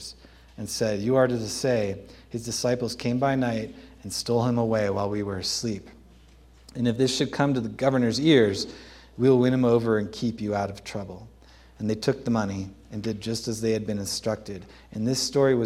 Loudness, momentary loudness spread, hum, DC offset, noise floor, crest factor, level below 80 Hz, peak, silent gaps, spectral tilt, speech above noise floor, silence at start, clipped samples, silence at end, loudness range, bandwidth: -25 LUFS; 16 LU; none; under 0.1%; -53 dBFS; 20 dB; -54 dBFS; -6 dBFS; none; -5 dB/octave; 28 dB; 0 s; under 0.1%; 0 s; 6 LU; 15.5 kHz